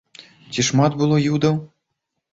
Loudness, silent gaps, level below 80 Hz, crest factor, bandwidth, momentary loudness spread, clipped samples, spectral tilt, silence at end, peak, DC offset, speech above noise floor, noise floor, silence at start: -19 LUFS; none; -54 dBFS; 18 dB; 8 kHz; 8 LU; under 0.1%; -5.5 dB/octave; 0.65 s; -4 dBFS; under 0.1%; 60 dB; -78 dBFS; 0.2 s